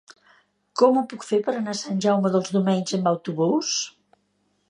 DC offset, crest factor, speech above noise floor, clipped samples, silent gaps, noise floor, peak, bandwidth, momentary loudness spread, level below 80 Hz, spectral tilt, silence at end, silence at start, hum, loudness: under 0.1%; 20 dB; 47 dB; under 0.1%; none; -69 dBFS; -4 dBFS; 10.5 kHz; 7 LU; -74 dBFS; -5 dB/octave; 0.8 s; 0.75 s; none; -23 LUFS